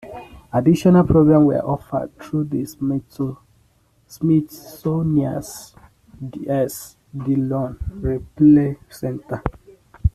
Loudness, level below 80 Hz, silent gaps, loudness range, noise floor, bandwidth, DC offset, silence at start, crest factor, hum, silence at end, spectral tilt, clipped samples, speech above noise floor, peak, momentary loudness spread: -19 LUFS; -38 dBFS; none; 6 LU; -59 dBFS; 14 kHz; under 0.1%; 0.05 s; 18 dB; none; 0.05 s; -8.5 dB/octave; under 0.1%; 40 dB; -2 dBFS; 19 LU